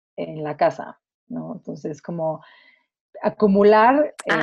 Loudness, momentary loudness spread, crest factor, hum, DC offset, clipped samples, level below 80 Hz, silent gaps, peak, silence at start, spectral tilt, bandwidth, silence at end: -19 LUFS; 21 LU; 18 dB; none; under 0.1%; under 0.1%; -62 dBFS; 1.14-1.27 s, 3.01-3.13 s; -4 dBFS; 0.2 s; -7 dB/octave; 11 kHz; 0 s